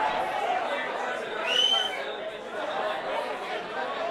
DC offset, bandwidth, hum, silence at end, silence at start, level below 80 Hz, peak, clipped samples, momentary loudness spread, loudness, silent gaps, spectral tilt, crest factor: under 0.1%; 16 kHz; none; 0 s; 0 s; -66 dBFS; -14 dBFS; under 0.1%; 11 LU; -28 LUFS; none; -1 dB/octave; 16 dB